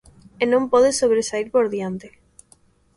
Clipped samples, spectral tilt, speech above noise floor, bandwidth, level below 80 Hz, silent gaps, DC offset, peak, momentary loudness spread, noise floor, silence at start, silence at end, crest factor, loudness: under 0.1%; -4 dB/octave; 38 dB; 11.5 kHz; -56 dBFS; none; under 0.1%; -6 dBFS; 12 LU; -57 dBFS; 0.4 s; 0.9 s; 16 dB; -20 LUFS